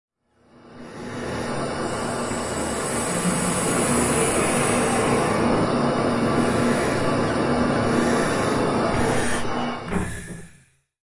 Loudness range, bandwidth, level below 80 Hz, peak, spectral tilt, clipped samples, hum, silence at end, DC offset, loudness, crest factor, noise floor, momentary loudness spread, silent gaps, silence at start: 4 LU; 11.5 kHz; -44 dBFS; -8 dBFS; -4.5 dB/octave; under 0.1%; none; 0.6 s; under 0.1%; -22 LUFS; 14 dB; -56 dBFS; 9 LU; none; 0.65 s